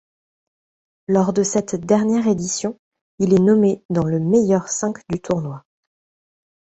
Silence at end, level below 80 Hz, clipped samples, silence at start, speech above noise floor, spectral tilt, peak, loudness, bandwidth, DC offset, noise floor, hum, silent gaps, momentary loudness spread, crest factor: 1.1 s; -54 dBFS; under 0.1%; 1.1 s; over 72 dB; -6 dB/octave; -4 dBFS; -19 LUFS; 8.2 kHz; under 0.1%; under -90 dBFS; none; 2.79-2.92 s, 3.01-3.18 s, 3.85-3.89 s; 10 LU; 16 dB